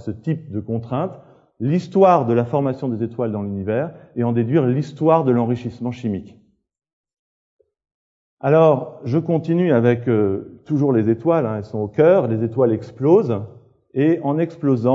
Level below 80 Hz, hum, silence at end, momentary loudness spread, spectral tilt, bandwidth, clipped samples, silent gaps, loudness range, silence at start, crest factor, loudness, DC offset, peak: -62 dBFS; none; 0 s; 11 LU; -9.5 dB/octave; 7.6 kHz; under 0.1%; 6.93-7.04 s, 7.19-7.59 s, 7.94-8.37 s; 4 LU; 0.05 s; 18 dB; -19 LUFS; under 0.1%; 0 dBFS